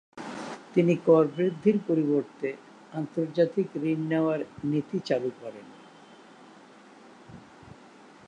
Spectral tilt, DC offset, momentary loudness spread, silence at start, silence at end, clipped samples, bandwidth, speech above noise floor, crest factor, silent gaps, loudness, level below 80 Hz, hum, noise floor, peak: -8 dB/octave; under 0.1%; 18 LU; 0.15 s; 0.55 s; under 0.1%; 9.8 kHz; 26 dB; 20 dB; none; -27 LUFS; -72 dBFS; none; -52 dBFS; -8 dBFS